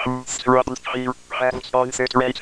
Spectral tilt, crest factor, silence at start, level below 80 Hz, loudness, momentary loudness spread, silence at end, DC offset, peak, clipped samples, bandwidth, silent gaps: -4 dB/octave; 20 dB; 0 s; -48 dBFS; -21 LUFS; 7 LU; 0 s; under 0.1%; -2 dBFS; under 0.1%; 11 kHz; none